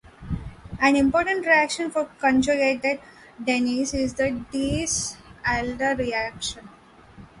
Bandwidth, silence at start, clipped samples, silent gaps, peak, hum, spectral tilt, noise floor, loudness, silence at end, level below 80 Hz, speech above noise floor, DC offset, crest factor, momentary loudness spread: 11.5 kHz; 0.2 s; under 0.1%; none; -6 dBFS; none; -4 dB/octave; -48 dBFS; -23 LUFS; 0 s; -44 dBFS; 25 dB; under 0.1%; 18 dB; 13 LU